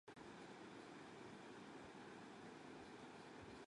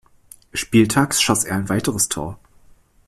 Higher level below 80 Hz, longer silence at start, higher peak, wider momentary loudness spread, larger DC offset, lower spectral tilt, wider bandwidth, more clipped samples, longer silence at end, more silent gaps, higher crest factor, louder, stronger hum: second, -82 dBFS vs -48 dBFS; second, 0.05 s vs 0.55 s; second, -46 dBFS vs -4 dBFS; second, 1 LU vs 11 LU; neither; about the same, -4.5 dB/octave vs -3.5 dB/octave; second, 11 kHz vs 15.5 kHz; neither; second, 0 s vs 0.7 s; neither; about the same, 14 dB vs 18 dB; second, -58 LUFS vs -19 LUFS; neither